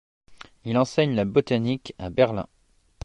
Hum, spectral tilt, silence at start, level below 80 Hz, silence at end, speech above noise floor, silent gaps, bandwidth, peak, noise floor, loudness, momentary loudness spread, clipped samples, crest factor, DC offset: none; -7 dB/octave; 0.3 s; -52 dBFS; 0.6 s; 20 dB; none; 11 kHz; -6 dBFS; -43 dBFS; -24 LUFS; 11 LU; under 0.1%; 20 dB; under 0.1%